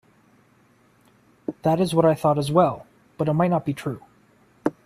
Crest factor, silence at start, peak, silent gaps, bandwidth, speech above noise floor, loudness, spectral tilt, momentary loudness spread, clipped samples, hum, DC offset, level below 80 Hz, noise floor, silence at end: 20 dB; 1.5 s; -4 dBFS; none; 15 kHz; 38 dB; -22 LUFS; -7.5 dB/octave; 17 LU; under 0.1%; none; under 0.1%; -60 dBFS; -59 dBFS; 0.15 s